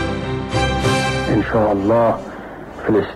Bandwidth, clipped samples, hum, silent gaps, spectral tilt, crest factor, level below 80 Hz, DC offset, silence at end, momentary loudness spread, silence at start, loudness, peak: 13 kHz; under 0.1%; none; none; -6 dB/octave; 12 dB; -34 dBFS; under 0.1%; 0 s; 12 LU; 0 s; -18 LUFS; -6 dBFS